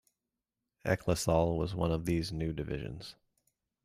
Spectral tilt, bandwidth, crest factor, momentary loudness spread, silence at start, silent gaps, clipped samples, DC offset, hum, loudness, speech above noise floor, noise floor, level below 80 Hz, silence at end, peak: -6 dB/octave; 15.5 kHz; 20 dB; 13 LU; 0.85 s; none; under 0.1%; under 0.1%; none; -33 LUFS; 57 dB; -89 dBFS; -50 dBFS; 0.75 s; -14 dBFS